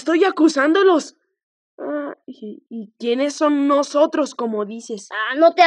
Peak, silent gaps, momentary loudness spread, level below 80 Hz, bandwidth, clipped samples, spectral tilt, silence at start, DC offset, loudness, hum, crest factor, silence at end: -2 dBFS; 1.43-1.78 s; 19 LU; -88 dBFS; 10.5 kHz; under 0.1%; -3.5 dB/octave; 0 s; under 0.1%; -18 LUFS; none; 18 dB; 0 s